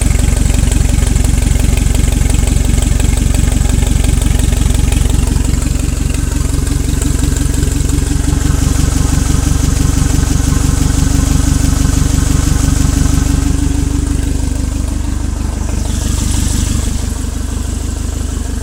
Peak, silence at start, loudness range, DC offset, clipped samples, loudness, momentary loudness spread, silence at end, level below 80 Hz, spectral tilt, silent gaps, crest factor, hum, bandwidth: 0 dBFS; 0 s; 4 LU; under 0.1%; 0.1%; -14 LUFS; 6 LU; 0 s; -14 dBFS; -5 dB/octave; none; 12 dB; none; 16.5 kHz